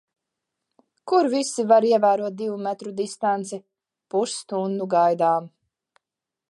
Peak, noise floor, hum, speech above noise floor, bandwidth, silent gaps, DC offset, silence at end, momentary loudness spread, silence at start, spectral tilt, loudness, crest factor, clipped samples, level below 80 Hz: -4 dBFS; -87 dBFS; none; 65 dB; 11.5 kHz; none; under 0.1%; 1.05 s; 11 LU; 1.05 s; -5 dB/octave; -22 LUFS; 18 dB; under 0.1%; -80 dBFS